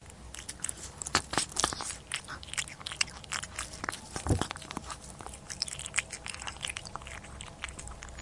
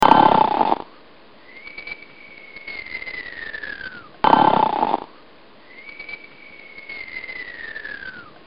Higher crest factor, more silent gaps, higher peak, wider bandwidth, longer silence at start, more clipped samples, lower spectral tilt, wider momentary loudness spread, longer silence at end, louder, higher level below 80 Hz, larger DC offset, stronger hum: first, 32 dB vs 22 dB; neither; second, -4 dBFS vs 0 dBFS; first, 11.5 kHz vs 7.4 kHz; about the same, 0 s vs 0 s; neither; second, -2 dB/octave vs -6 dB/octave; second, 13 LU vs 25 LU; second, 0 s vs 0.25 s; second, -35 LUFS vs -21 LUFS; first, -50 dBFS vs -56 dBFS; second, under 0.1% vs 0.5%; neither